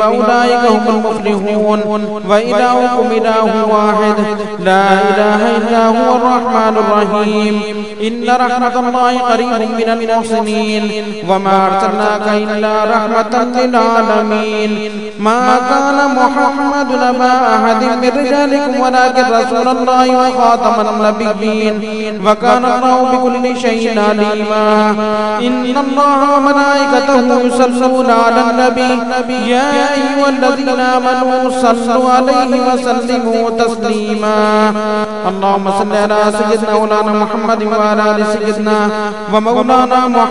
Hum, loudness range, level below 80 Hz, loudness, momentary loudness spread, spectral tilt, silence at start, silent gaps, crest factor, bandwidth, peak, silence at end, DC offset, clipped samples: none; 2 LU; -50 dBFS; -11 LUFS; 5 LU; -5 dB/octave; 0 s; none; 12 dB; 11 kHz; 0 dBFS; 0 s; 2%; 0.2%